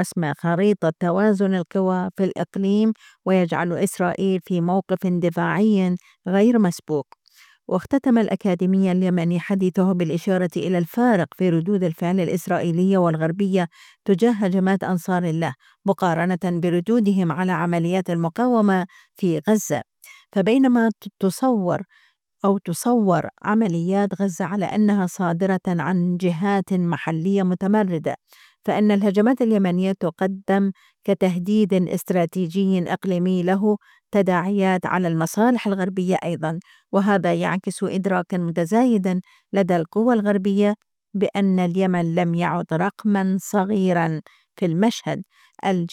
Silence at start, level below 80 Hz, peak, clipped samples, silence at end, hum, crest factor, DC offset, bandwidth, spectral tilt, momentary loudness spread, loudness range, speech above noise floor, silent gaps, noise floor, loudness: 0 s; -66 dBFS; -6 dBFS; under 0.1%; 0.05 s; none; 14 dB; under 0.1%; 15 kHz; -7 dB/octave; 6 LU; 1 LU; 34 dB; none; -54 dBFS; -21 LUFS